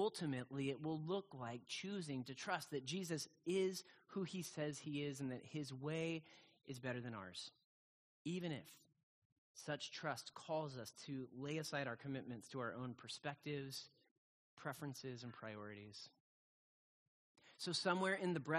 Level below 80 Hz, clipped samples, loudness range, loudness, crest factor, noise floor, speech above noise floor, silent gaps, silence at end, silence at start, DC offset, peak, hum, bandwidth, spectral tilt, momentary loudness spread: -84 dBFS; under 0.1%; 6 LU; -46 LUFS; 24 dB; under -90 dBFS; over 44 dB; 7.64-8.25 s, 9.03-9.55 s, 14.11-14.57 s, 16.20-17.35 s; 0 s; 0 s; under 0.1%; -24 dBFS; none; 13 kHz; -5 dB/octave; 11 LU